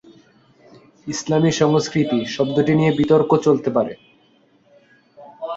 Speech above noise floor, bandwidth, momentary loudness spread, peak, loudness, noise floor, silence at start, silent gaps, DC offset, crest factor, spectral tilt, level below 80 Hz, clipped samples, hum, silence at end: 39 dB; 8 kHz; 12 LU; -2 dBFS; -18 LUFS; -57 dBFS; 1.05 s; none; under 0.1%; 18 dB; -6 dB/octave; -56 dBFS; under 0.1%; none; 0 s